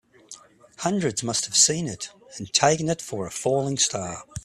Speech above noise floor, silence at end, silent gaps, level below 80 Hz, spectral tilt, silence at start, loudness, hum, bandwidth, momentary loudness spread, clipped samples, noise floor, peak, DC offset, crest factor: 24 dB; 0.05 s; none; -58 dBFS; -2.5 dB/octave; 0.3 s; -23 LUFS; none; 14.5 kHz; 15 LU; under 0.1%; -48 dBFS; -4 dBFS; under 0.1%; 22 dB